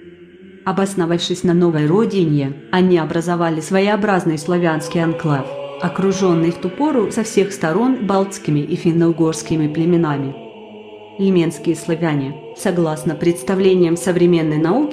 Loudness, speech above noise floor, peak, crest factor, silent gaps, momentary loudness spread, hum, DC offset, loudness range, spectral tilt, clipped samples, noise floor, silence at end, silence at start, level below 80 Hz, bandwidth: -17 LUFS; 24 dB; -2 dBFS; 14 dB; none; 8 LU; none; under 0.1%; 3 LU; -6.5 dB/octave; under 0.1%; -41 dBFS; 0 s; 0 s; -54 dBFS; 13.5 kHz